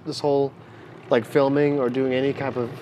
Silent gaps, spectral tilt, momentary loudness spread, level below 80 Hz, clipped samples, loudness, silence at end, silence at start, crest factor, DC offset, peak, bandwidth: none; -7 dB/octave; 8 LU; -70 dBFS; under 0.1%; -22 LUFS; 0 s; 0.05 s; 18 dB; under 0.1%; -6 dBFS; 13 kHz